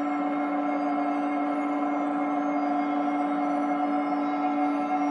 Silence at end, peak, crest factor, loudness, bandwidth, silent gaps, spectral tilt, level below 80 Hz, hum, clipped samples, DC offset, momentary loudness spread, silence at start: 0 s; -16 dBFS; 12 dB; -27 LUFS; 6.8 kHz; none; -6.5 dB/octave; -86 dBFS; none; under 0.1%; under 0.1%; 1 LU; 0 s